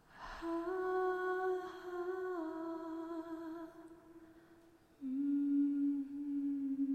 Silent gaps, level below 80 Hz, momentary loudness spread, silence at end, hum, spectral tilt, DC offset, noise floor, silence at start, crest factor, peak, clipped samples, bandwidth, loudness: none; -70 dBFS; 17 LU; 0 s; none; -6 dB/octave; under 0.1%; -64 dBFS; 0.1 s; 12 dB; -26 dBFS; under 0.1%; 8.4 kHz; -39 LUFS